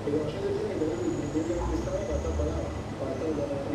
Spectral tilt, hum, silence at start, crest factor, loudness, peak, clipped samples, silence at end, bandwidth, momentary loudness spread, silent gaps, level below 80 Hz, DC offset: -7 dB/octave; none; 0 s; 14 dB; -31 LUFS; -16 dBFS; under 0.1%; 0 s; 12 kHz; 3 LU; none; -38 dBFS; under 0.1%